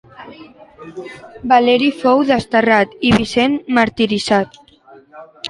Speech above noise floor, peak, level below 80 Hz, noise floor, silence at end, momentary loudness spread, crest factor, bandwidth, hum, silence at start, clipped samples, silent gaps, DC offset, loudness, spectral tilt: 30 dB; 0 dBFS; -46 dBFS; -45 dBFS; 0 s; 20 LU; 16 dB; 11.5 kHz; none; 0.2 s; under 0.1%; none; under 0.1%; -14 LUFS; -5 dB/octave